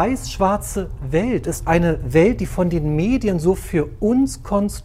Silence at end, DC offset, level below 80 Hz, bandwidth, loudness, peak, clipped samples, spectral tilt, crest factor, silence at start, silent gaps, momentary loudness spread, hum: 0 s; under 0.1%; -32 dBFS; 16 kHz; -19 LUFS; -2 dBFS; under 0.1%; -6.5 dB/octave; 16 dB; 0 s; none; 6 LU; none